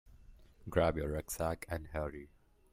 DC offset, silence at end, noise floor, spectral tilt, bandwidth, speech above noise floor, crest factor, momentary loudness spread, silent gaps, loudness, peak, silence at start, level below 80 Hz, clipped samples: under 0.1%; 0.45 s; -58 dBFS; -5.5 dB/octave; 16 kHz; 22 dB; 22 dB; 13 LU; none; -37 LUFS; -16 dBFS; 0.05 s; -50 dBFS; under 0.1%